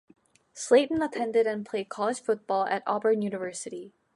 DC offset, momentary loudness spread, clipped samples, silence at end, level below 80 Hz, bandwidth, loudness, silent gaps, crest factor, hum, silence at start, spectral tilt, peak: under 0.1%; 14 LU; under 0.1%; 0.25 s; -70 dBFS; 11.5 kHz; -27 LUFS; none; 18 dB; none; 0.55 s; -4 dB/octave; -10 dBFS